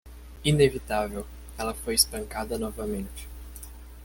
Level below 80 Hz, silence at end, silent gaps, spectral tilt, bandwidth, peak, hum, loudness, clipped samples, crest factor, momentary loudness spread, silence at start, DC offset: -42 dBFS; 0 s; none; -4 dB/octave; 17 kHz; -6 dBFS; none; -27 LUFS; under 0.1%; 22 dB; 20 LU; 0.05 s; under 0.1%